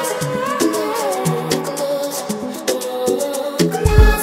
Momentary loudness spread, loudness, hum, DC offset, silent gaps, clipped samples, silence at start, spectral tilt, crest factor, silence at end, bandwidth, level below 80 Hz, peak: 7 LU; -19 LUFS; none; under 0.1%; none; under 0.1%; 0 s; -5 dB/octave; 18 dB; 0 s; 16 kHz; -22 dBFS; 0 dBFS